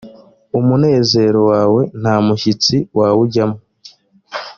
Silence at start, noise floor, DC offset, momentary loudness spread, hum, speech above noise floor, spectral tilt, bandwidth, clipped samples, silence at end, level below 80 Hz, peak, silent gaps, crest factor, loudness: 0.05 s; -44 dBFS; under 0.1%; 9 LU; none; 31 dB; -6 dB/octave; 7.4 kHz; under 0.1%; 0.05 s; -52 dBFS; 0 dBFS; none; 14 dB; -14 LUFS